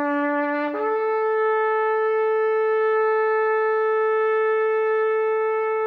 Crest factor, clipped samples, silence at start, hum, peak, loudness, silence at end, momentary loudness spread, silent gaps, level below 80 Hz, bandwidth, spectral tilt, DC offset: 6 dB; under 0.1%; 0 s; none; -14 dBFS; -21 LUFS; 0 s; 2 LU; none; -76 dBFS; 4.6 kHz; -5.5 dB/octave; under 0.1%